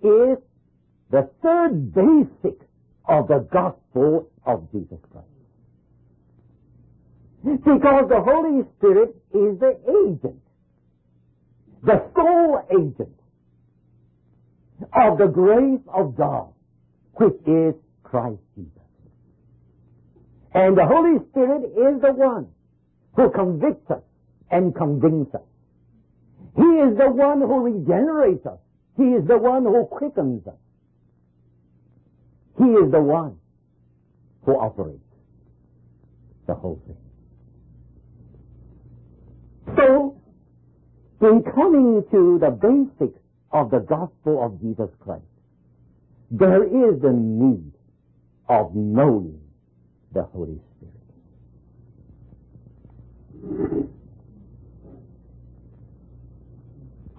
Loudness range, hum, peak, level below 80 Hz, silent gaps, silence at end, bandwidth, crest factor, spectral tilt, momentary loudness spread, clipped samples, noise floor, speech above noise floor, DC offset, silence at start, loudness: 16 LU; none; -4 dBFS; -52 dBFS; none; 0.1 s; 3.8 kHz; 16 dB; -13 dB/octave; 17 LU; under 0.1%; -62 dBFS; 44 dB; under 0.1%; 0.05 s; -19 LUFS